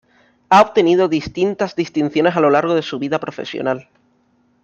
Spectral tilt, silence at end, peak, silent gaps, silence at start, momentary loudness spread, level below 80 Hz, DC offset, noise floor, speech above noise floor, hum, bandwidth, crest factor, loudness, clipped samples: -6 dB/octave; 0.8 s; 0 dBFS; none; 0.5 s; 10 LU; -54 dBFS; under 0.1%; -59 dBFS; 43 dB; none; 8.2 kHz; 16 dB; -17 LUFS; under 0.1%